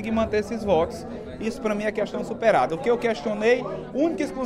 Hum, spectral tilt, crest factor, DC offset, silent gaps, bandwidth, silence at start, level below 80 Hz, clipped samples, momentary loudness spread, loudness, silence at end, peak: none; -6 dB/octave; 16 dB; under 0.1%; none; 12.5 kHz; 0 s; -48 dBFS; under 0.1%; 9 LU; -24 LUFS; 0 s; -8 dBFS